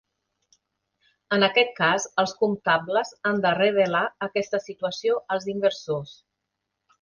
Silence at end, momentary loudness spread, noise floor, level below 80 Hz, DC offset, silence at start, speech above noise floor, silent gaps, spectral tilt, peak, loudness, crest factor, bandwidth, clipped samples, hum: 0.9 s; 9 LU; -81 dBFS; -68 dBFS; under 0.1%; 1.3 s; 58 dB; none; -4 dB/octave; -4 dBFS; -24 LUFS; 20 dB; 10 kHz; under 0.1%; none